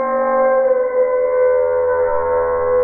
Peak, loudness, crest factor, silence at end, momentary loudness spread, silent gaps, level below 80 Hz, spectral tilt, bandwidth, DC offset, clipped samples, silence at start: -6 dBFS; -16 LUFS; 10 dB; 0 s; 3 LU; none; -44 dBFS; 1 dB/octave; 2.5 kHz; under 0.1%; under 0.1%; 0 s